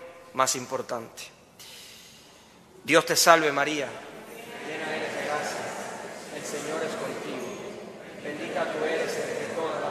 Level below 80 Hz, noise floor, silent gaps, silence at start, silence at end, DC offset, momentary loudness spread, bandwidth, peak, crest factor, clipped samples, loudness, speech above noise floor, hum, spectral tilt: -70 dBFS; -53 dBFS; none; 0 s; 0 s; under 0.1%; 22 LU; 14 kHz; 0 dBFS; 28 dB; under 0.1%; -27 LUFS; 29 dB; none; -2.5 dB/octave